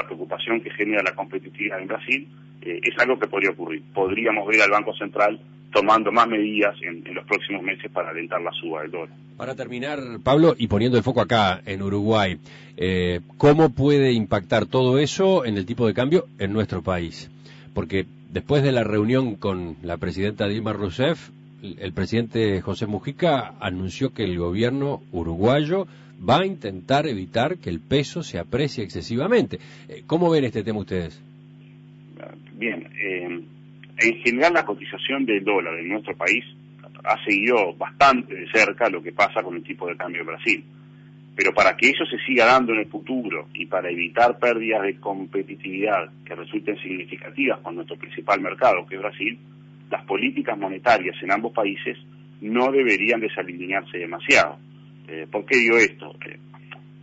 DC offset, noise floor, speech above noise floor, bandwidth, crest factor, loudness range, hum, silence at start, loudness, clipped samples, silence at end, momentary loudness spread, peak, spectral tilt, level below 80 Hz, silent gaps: under 0.1%; -46 dBFS; 23 dB; 8 kHz; 18 dB; 6 LU; none; 0 s; -22 LUFS; under 0.1%; 0 s; 14 LU; -6 dBFS; -5.5 dB/octave; -54 dBFS; none